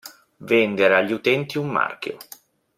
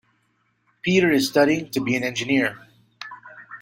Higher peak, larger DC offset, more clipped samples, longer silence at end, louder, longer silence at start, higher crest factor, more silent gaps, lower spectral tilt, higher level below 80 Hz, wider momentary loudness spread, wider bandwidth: about the same, -2 dBFS vs -4 dBFS; neither; neither; first, 0.55 s vs 0.05 s; about the same, -20 LUFS vs -21 LUFS; second, 0.05 s vs 0.85 s; about the same, 20 dB vs 18 dB; neither; about the same, -5.5 dB/octave vs -5 dB/octave; second, -66 dBFS vs -60 dBFS; second, 15 LU vs 21 LU; about the same, 16 kHz vs 16.5 kHz